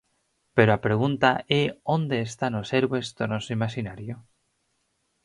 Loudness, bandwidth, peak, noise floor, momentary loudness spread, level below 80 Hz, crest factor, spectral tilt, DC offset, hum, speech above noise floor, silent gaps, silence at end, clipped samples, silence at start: -25 LUFS; 11.5 kHz; -4 dBFS; -73 dBFS; 13 LU; -58 dBFS; 22 dB; -6 dB/octave; under 0.1%; none; 49 dB; none; 1.05 s; under 0.1%; 0.55 s